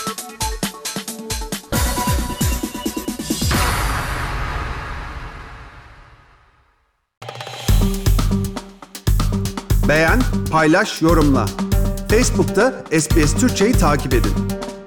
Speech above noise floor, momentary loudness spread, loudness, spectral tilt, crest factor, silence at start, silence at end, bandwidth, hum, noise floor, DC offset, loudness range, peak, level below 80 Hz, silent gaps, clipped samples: 48 dB; 14 LU; -19 LUFS; -5 dB/octave; 12 dB; 0 s; 0 s; 19.5 kHz; none; -63 dBFS; under 0.1%; 10 LU; -6 dBFS; -24 dBFS; 7.17-7.21 s; under 0.1%